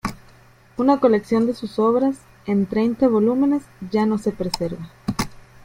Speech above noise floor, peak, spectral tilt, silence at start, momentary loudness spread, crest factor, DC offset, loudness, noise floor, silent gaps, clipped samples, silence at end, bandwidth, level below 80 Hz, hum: 31 dB; -2 dBFS; -6.5 dB/octave; 0.05 s; 11 LU; 18 dB; under 0.1%; -21 LUFS; -50 dBFS; none; under 0.1%; 0.3 s; 16.5 kHz; -48 dBFS; none